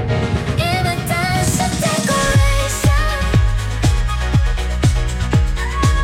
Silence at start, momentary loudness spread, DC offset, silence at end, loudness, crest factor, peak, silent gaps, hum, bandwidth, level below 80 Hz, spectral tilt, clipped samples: 0 s; 4 LU; under 0.1%; 0 s; -17 LUFS; 12 dB; -4 dBFS; none; none; 16.5 kHz; -20 dBFS; -5 dB/octave; under 0.1%